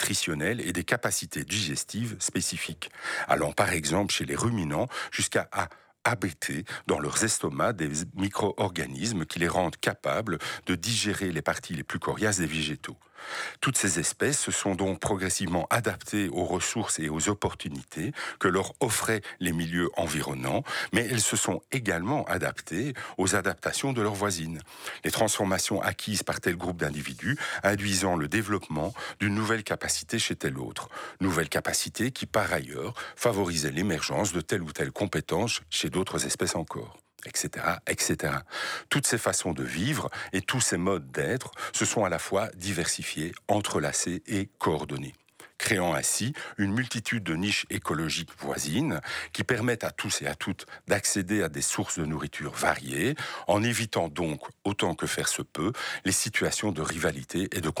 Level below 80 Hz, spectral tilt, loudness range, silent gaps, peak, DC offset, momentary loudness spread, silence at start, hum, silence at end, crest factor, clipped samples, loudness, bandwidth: -56 dBFS; -3.5 dB/octave; 2 LU; none; -8 dBFS; under 0.1%; 7 LU; 0 s; none; 0 s; 20 dB; under 0.1%; -29 LUFS; 19.5 kHz